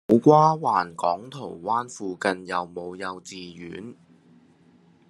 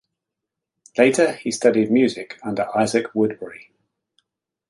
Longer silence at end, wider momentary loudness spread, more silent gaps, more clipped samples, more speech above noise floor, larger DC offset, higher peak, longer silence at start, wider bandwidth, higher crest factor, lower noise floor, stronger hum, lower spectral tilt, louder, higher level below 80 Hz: about the same, 1.15 s vs 1.05 s; first, 21 LU vs 12 LU; neither; neither; second, 33 dB vs 64 dB; neither; about the same, -2 dBFS vs -2 dBFS; second, 0.1 s vs 0.95 s; about the same, 11.5 kHz vs 11.5 kHz; about the same, 22 dB vs 20 dB; second, -57 dBFS vs -84 dBFS; neither; first, -6.5 dB/octave vs -4.5 dB/octave; second, -23 LUFS vs -20 LUFS; second, -70 dBFS vs -64 dBFS